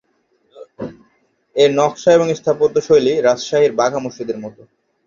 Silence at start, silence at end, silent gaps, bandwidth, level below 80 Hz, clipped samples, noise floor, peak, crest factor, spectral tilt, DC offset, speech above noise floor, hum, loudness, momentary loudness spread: 0.55 s; 0.55 s; none; 7.4 kHz; -58 dBFS; under 0.1%; -62 dBFS; -2 dBFS; 16 dB; -5 dB/octave; under 0.1%; 47 dB; none; -15 LUFS; 18 LU